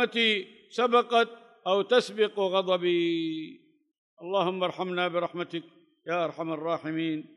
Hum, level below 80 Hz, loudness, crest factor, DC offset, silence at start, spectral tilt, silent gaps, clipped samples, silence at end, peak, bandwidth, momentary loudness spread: none; -88 dBFS; -28 LUFS; 18 dB; under 0.1%; 0 s; -5 dB/octave; 3.98-4.17 s; under 0.1%; 0.15 s; -10 dBFS; 11 kHz; 13 LU